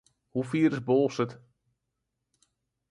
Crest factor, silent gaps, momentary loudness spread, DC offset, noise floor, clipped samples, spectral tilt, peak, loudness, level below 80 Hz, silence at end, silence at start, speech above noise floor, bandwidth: 18 dB; none; 10 LU; under 0.1%; -83 dBFS; under 0.1%; -7.5 dB/octave; -14 dBFS; -28 LUFS; -70 dBFS; 1.55 s; 0.35 s; 56 dB; 11 kHz